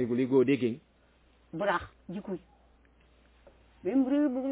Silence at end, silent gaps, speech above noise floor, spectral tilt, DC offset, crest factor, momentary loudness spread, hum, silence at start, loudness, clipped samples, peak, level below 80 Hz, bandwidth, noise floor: 0 s; none; 35 dB; -6 dB/octave; under 0.1%; 18 dB; 17 LU; none; 0 s; -30 LUFS; under 0.1%; -14 dBFS; -62 dBFS; 4 kHz; -64 dBFS